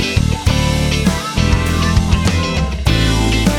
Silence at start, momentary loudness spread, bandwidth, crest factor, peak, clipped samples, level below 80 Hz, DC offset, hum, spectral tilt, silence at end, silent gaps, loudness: 0 s; 3 LU; 17 kHz; 14 dB; 0 dBFS; under 0.1%; -20 dBFS; under 0.1%; none; -5 dB/octave; 0 s; none; -15 LUFS